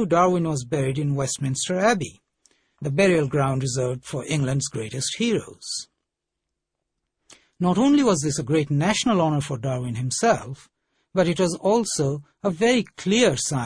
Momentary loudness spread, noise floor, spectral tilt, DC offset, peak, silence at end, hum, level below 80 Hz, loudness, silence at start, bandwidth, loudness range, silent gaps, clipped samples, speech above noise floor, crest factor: 9 LU; -82 dBFS; -5 dB/octave; under 0.1%; -6 dBFS; 0 s; none; -54 dBFS; -23 LUFS; 0 s; 10.5 kHz; 5 LU; none; under 0.1%; 60 dB; 18 dB